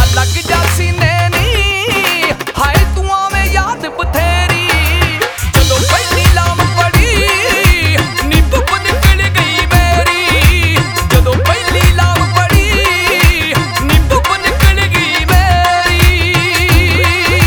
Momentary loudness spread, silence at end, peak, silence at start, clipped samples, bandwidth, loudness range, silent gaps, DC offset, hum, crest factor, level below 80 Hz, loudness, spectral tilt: 4 LU; 0 s; 0 dBFS; 0 s; 0.2%; over 20 kHz; 2 LU; none; under 0.1%; none; 10 dB; -16 dBFS; -10 LUFS; -4 dB/octave